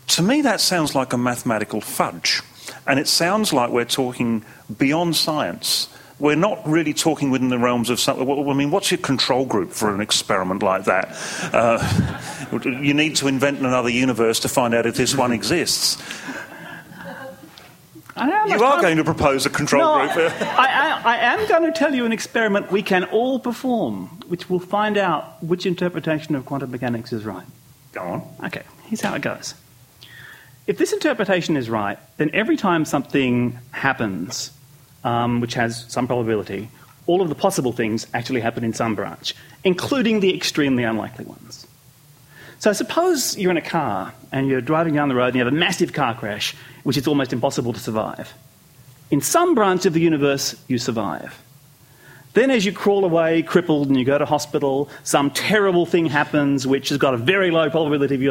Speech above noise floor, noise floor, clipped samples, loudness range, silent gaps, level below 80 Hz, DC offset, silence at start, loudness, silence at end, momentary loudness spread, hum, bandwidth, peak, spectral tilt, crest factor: 30 dB; -50 dBFS; under 0.1%; 5 LU; none; -54 dBFS; under 0.1%; 0.05 s; -20 LUFS; 0 s; 12 LU; none; 16.5 kHz; -2 dBFS; -4 dB/octave; 20 dB